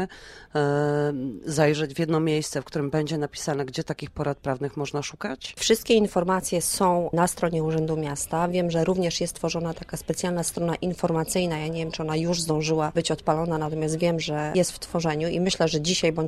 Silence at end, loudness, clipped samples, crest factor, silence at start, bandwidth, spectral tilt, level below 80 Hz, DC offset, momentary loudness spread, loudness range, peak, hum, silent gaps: 0 s; -25 LUFS; under 0.1%; 18 dB; 0 s; 15 kHz; -5 dB/octave; -50 dBFS; under 0.1%; 7 LU; 3 LU; -6 dBFS; none; none